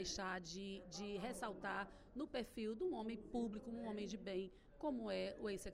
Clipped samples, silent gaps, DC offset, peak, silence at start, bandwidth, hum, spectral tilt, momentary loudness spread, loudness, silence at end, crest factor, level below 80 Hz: under 0.1%; none; under 0.1%; -32 dBFS; 0 s; 15.5 kHz; none; -4.5 dB/octave; 6 LU; -47 LUFS; 0 s; 16 dB; -64 dBFS